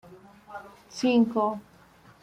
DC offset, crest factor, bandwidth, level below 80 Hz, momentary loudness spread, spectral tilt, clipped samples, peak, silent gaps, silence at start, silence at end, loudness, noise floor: under 0.1%; 18 dB; 10 kHz; -68 dBFS; 21 LU; -5.5 dB/octave; under 0.1%; -12 dBFS; none; 0.1 s; 0.6 s; -25 LUFS; -55 dBFS